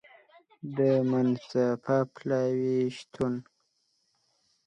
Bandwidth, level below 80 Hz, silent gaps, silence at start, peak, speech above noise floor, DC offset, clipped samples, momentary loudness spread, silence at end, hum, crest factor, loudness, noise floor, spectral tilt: 9 kHz; -70 dBFS; none; 0.65 s; -14 dBFS; 47 dB; under 0.1%; under 0.1%; 8 LU; 1.25 s; none; 16 dB; -28 LUFS; -74 dBFS; -8 dB/octave